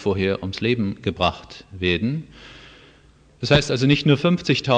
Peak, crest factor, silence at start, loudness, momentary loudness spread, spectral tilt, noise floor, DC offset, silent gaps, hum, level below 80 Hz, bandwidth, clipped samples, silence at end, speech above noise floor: -2 dBFS; 18 dB; 0 s; -21 LUFS; 21 LU; -6 dB/octave; -52 dBFS; under 0.1%; none; none; -44 dBFS; 9.2 kHz; under 0.1%; 0 s; 32 dB